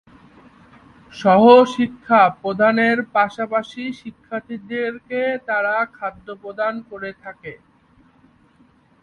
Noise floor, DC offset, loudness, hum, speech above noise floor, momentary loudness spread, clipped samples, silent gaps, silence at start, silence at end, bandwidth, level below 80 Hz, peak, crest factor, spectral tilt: -55 dBFS; under 0.1%; -18 LUFS; none; 37 dB; 20 LU; under 0.1%; none; 1.15 s; 1.5 s; 9.2 kHz; -60 dBFS; 0 dBFS; 20 dB; -6 dB/octave